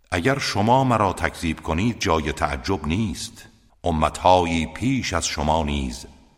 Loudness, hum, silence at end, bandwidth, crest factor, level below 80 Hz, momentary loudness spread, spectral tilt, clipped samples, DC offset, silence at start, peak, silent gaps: -22 LUFS; none; 0.25 s; 16 kHz; 20 dB; -36 dBFS; 10 LU; -5 dB/octave; under 0.1%; under 0.1%; 0.1 s; -2 dBFS; none